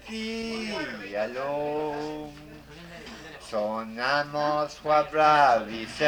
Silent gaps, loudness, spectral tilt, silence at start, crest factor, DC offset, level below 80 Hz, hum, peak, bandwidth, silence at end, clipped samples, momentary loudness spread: none; -26 LUFS; -4.5 dB/octave; 0 s; 20 dB; under 0.1%; -56 dBFS; none; -8 dBFS; over 20 kHz; 0 s; under 0.1%; 21 LU